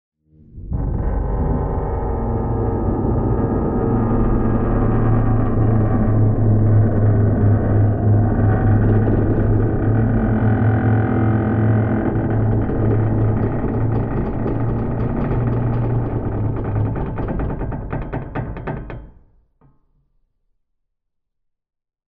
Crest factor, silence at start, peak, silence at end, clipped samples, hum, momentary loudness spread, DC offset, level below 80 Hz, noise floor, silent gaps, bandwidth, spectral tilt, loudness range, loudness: 14 dB; 0.55 s; -4 dBFS; 3.05 s; under 0.1%; none; 8 LU; under 0.1%; -26 dBFS; -74 dBFS; none; 3 kHz; -13.5 dB/octave; 10 LU; -19 LUFS